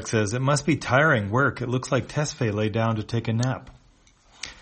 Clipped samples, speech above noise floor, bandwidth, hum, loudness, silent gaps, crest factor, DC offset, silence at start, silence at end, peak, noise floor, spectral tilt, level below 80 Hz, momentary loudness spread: under 0.1%; 34 dB; 8.8 kHz; none; -24 LUFS; none; 18 dB; under 0.1%; 0 s; 0.1 s; -6 dBFS; -57 dBFS; -5.5 dB/octave; -52 dBFS; 8 LU